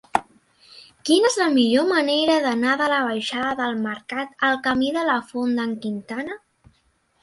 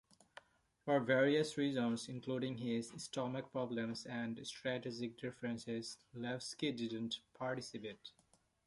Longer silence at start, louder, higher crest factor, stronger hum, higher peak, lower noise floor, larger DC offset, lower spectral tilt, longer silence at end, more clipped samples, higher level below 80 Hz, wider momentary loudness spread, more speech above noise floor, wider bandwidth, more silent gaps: second, 0.15 s vs 0.85 s; first, -21 LUFS vs -41 LUFS; about the same, 20 dB vs 22 dB; neither; first, -2 dBFS vs -20 dBFS; about the same, -65 dBFS vs -63 dBFS; neither; second, -3.5 dB/octave vs -5 dB/octave; first, 0.85 s vs 0.55 s; neither; first, -62 dBFS vs -78 dBFS; second, 11 LU vs 15 LU; first, 44 dB vs 23 dB; about the same, 11.5 kHz vs 11.5 kHz; neither